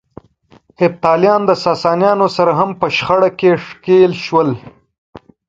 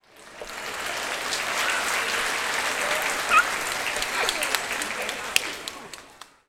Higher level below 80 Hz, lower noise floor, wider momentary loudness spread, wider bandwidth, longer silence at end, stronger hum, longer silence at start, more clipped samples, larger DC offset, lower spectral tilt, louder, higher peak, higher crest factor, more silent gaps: about the same, -54 dBFS vs -56 dBFS; about the same, -49 dBFS vs -48 dBFS; second, 6 LU vs 15 LU; second, 7.6 kHz vs over 20 kHz; about the same, 0.3 s vs 0.25 s; neither; first, 0.8 s vs 0.15 s; neither; neither; first, -6.5 dB/octave vs 0 dB/octave; first, -13 LUFS vs -25 LUFS; about the same, 0 dBFS vs 0 dBFS; second, 14 dB vs 28 dB; first, 4.98-5.13 s vs none